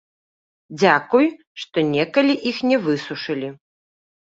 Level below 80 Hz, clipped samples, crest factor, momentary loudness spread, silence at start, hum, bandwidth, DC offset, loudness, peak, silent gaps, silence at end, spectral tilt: -66 dBFS; under 0.1%; 20 dB; 11 LU; 0.7 s; none; 7.8 kHz; under 0.1%; -20 LUFS; -2 dBFS; 1.47-1.55 s; 0.8 s; -5.5 dB/octave